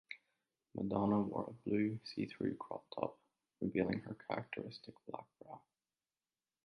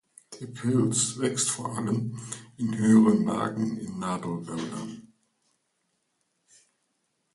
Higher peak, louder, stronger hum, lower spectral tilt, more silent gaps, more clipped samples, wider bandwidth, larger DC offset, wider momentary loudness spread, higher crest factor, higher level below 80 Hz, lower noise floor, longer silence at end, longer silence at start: second, -20 dBFS vs -8 dBFS; second, -41 LUFS vs -26 LUFS; neither; first, -8.5 dB/octave vs -5 dB/octave; neither; neither; second, 6.2 kHz vs 11.5 kHz; neither; about the same, 17 LU vs 19 LU; about the same, 22 dB vs 20 dB; second, -72 dBFS vs -66 dBFS; first, under -90 dBFS vs -76 dBFS; second, 1.05 s vs 2.35 s; second, 0.1 s vs 0.3 s